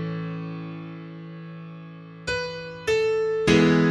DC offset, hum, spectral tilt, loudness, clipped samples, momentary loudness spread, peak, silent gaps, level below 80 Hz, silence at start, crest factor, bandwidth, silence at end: under 0.1%; none; -6 dB/octave; -24 LUFS; under 0.1%; 21 LU; -4 dBFS; none; -50 dBFS; 0 s; 20 dB; 11.5 kHz; 0 s